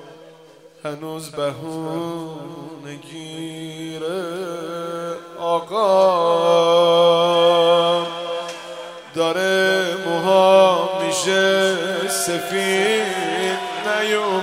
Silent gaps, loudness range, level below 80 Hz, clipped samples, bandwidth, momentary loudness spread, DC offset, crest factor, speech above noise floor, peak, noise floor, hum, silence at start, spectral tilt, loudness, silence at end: none; 13 LU; -70 dBFS; under 0.1%; 16 kHz; 17 LU; under 0.1%; 18 dB; 26 dB; -2 dBFS; -46 dBFS; none; 0 s; -3.5 dB/octave; -18 LUFS; 0 s